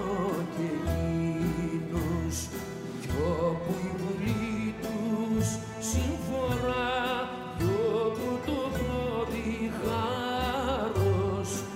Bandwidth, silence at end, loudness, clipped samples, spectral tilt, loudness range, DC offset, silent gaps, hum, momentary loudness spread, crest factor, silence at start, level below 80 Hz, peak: 16 kHz; 0 s; -30 LUFS; under 0.1%; -5.5 dB/octave; 2 LU; under 0.1%; none; none; 5 LU; 14 dB; 0 s; -44 dBFS; -16 dBFS